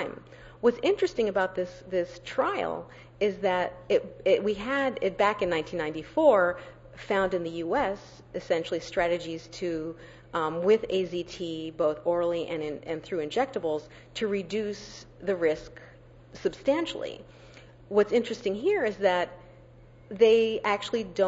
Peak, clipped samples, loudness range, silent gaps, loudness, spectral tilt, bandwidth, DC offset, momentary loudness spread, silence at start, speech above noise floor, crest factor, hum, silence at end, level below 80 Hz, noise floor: -8 dBFS; under 0.1%; 5 LU; none; -28 LUFS; -5.5 dB/octave; 8 kHz; under 0.1%; 13 LU; 0 s; 24 dB; 20 dB; none; 0 s; -58 dBFS; -52 dBFS